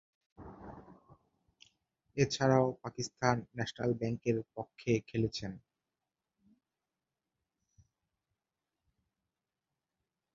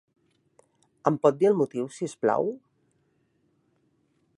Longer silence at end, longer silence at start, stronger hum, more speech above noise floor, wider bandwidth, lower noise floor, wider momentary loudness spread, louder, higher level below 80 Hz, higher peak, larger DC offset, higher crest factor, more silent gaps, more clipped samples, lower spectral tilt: first, 4.75 s vs 1.8 s; second, 0.4 s vs 1.05 s; neither; first, over 57 dB vs 46 dB; second, 7.4 kHz vs 11.5 kHz; first, under -90 dBFS vs -70 dBFS; first, 23 LU vs 11 LU; second, -34 LUFS vs -26 LUFS; first, -66 dBFS vs -78 dBFS; second, -12 dBFS vs -6 dBFS; neither; about the same, 26 dB vs 24 dB; neither; neither; second, -5.5 dB/octave vs -7 dB/octave